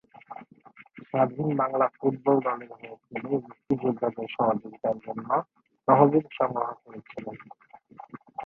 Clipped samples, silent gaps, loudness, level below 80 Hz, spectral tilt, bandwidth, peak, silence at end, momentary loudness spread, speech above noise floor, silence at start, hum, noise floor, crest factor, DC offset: under 0.1%; none; -27 LUFS; -70 dBFS; -10.5 dB/octave; 4.2 kHz; -4 dBFS; 0 s; 22 LU; 27 dB; 0.3 s; none; -54 dBFS; 24 dB; under 0.1%